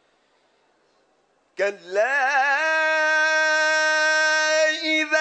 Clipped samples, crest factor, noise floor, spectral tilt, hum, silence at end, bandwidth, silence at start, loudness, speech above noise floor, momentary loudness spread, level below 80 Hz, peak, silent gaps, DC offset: under 0.1%; 14 dB; -65 dBFS; 0.5 dB/octave; none; 0 s; 9 kHz; 1.6 s; -19 LUFS; 43 dB; 6 LU; -86 dBFS; -8 dBFS; none; under 0.1%